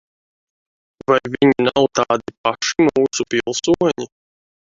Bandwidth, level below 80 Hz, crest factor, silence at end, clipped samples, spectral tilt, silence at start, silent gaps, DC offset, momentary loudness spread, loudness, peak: 7.8 kHz; -54 dBFS; 18 dB; 0.7 s; under 0.1%; -4 dB/octave; 1.1 s; 2.37-2.44 s; under 0.1%; 7 LU; -17 LUFS; 0 dBFS